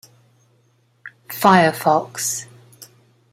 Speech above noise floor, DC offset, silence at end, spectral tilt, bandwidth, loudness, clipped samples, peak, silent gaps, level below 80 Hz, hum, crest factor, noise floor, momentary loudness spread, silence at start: 43 dB; under 0.1%; 0.5 s; -4 dB/octave; 16 kHz; -17 LUFS; under 0.1%; -2 dBFS; none; -64 dBFS; none; 20 dB; -60 dBFS; 13 LU; 1.05 s